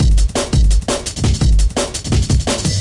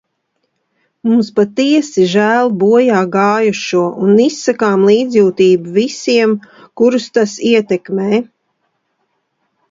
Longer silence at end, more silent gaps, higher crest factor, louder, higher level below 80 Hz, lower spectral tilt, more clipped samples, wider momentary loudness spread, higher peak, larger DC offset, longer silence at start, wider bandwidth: second, 0 s vs 1.5 s; neither; about the same, 10 dB vs 12 dB; second, -16 LUFS vs -12 LUFS; first, -16 dBFS vs -60 dBFS; about the same, -5 dB/octave vs -5.5 dB/octave; neither; second, 3 LU vs 6 LU; second, -4 dBFS vs 0 dBFS; neither; second, 0 s vs 1.05 s; first, 11.5 kHz vs 7.8 kHz